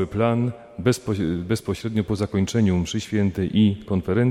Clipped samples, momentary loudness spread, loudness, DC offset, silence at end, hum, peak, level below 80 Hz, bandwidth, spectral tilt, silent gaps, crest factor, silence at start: under 0.1%; 5 LU; -23 LUFS; under 0.1%; 0 s; none; -6 dBFS; -46 dBFS; 14.5 kHz; -6.5 dB/octave; none; 16 dB; 0 s